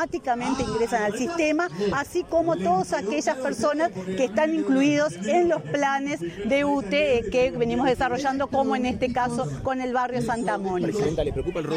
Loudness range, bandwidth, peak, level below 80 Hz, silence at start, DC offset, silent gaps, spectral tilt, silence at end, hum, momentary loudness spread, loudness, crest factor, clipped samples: 2 LU; 15.5 kHz; -10 dBFS; -46 dBFS; 0 s; under 0.1%; none; -5.5 dB/octave; 0 s; none; 5 LU; -24 LUFS; 14 dB; under 0.1%